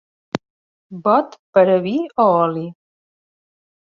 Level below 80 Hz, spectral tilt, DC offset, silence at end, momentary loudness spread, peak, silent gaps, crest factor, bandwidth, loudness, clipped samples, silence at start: -66 dBFS; -7.5 dB/octave; under 0.1%; 1.15 s; 14 LU; -2 dBFS; 0.50-0.90 s, 1.39-1.53 s; 18 dB; 7 kHz; -17 LUFS; under 0.1%; 0.35 s